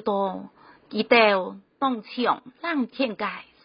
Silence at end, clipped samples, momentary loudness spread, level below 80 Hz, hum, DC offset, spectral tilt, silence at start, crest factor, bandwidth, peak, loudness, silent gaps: 0.2 s; under 0.1%; 14 LU; -72 dBFS; none; under 0.1%; -9 dB/octave; 0 s; 20 dB; 5.4 kHz; -4 dBFS; -24 LUFS; none